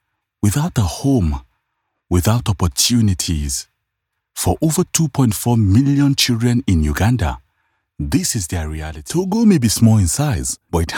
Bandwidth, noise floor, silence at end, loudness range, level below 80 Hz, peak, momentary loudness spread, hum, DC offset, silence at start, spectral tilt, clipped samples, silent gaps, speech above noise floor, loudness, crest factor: 18 kHz; -76 dBFS; 0 s; 3 LU; -34 dBFS; 0 dBFS; 10 LU; none; under 0.1%; 0.45 s; -5 dB/octave; under 0.1%; none; 60 dB; -17 LUFS; 16 dB